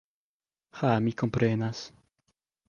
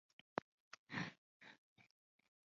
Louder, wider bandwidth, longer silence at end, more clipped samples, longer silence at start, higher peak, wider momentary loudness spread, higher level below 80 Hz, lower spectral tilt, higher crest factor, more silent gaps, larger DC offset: first, -28 LUFS vs -50 LUFS; about the same, 7.2 kHz vs 7.4 kHz; about the same, 0.8 s vs 0.7 s; neither; first, 0.75 s vs 0.35 s; first, -10 dBFS vs -20 dBFS; second, 13 LU vs 16 LU; first, -60 dBFS vs -86 dBFS; first, -7 dB/octave vs -3.5 dB/octave; second, 20 dB vs 34 dB; second, none vs 0.42-0.71 s, 0.78-0.87 s, 1.18-1.40 s, 1.58-1.76 s; neither